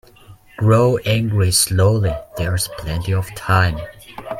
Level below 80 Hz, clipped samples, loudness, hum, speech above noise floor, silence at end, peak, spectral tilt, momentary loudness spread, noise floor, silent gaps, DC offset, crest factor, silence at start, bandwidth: -38 dBFS; under 0.1%; -17 LUFS; none; 28 dB; 0 s; -2 dBFS; -4.5 dB/octave; 10 LU; -45 dBFS; none; under 0.1%; 16 dB; 0.3 s; 16 kHz